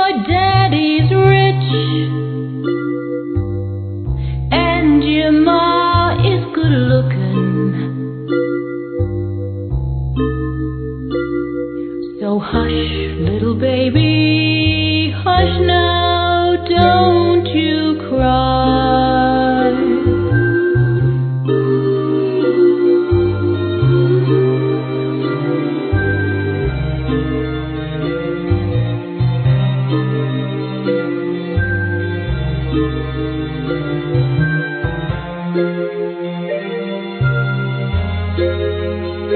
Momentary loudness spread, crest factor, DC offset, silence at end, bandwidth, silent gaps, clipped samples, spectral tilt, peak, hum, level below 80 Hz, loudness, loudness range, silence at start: 9 LU; 14 dB; under 0.1%; 0 s; 4.5 kHz; none; under 0.1%; -5.5 dB/octave; 0 dBFS; none; -30 dBFS; -16 LUFS; 6 LU; 0 s